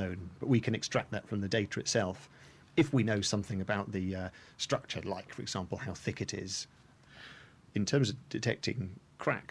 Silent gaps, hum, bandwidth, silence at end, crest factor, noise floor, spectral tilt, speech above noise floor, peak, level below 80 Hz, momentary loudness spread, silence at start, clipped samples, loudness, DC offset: none; none; 11 kHz; 0 s; 18 dB; -55 dBFS; -5 dB/octave; 21 dB; -16 dBFS; -64 dBFS; 12 LU; 0 s; under 0.1%; -34 LUFS; under 0.1%